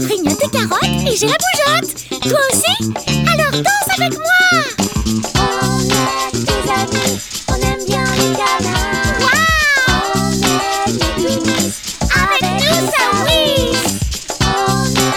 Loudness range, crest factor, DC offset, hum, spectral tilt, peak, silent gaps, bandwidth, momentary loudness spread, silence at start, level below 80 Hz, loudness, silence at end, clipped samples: 2 LU; 14 dB; under 0.1%; none; -3.5 dB/octave; 0 dBFS; none; over 20 kHz; 6 LU; 0 s; -30 dBFS; -14 LUFS; 0 s; under 0.1%